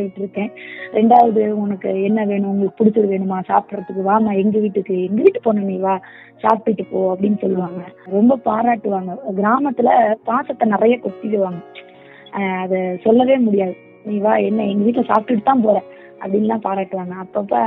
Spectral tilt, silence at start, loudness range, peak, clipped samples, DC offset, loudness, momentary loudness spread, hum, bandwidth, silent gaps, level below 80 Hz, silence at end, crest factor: -10.5 dB/octave; 0 s; 2 LU; 0 dBFS; under 0.1%; under 0.1%; -17 LUFS; 10 LU; none; 4 kHz; none; -64 dBFS; 0 s; 18 dB